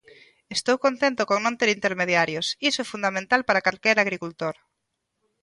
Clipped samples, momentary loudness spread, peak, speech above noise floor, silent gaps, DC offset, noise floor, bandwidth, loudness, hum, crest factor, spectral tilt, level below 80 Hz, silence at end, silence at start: under 0.1%; 9 LU; -4 dBFS; 55 dB; none; under 0.1%; -79 dBFS; 11.5 kHz; -23 LUFS; none; 20 dB; -3 dB/octave; -66 dBFS; 0.9 s; 0.5 s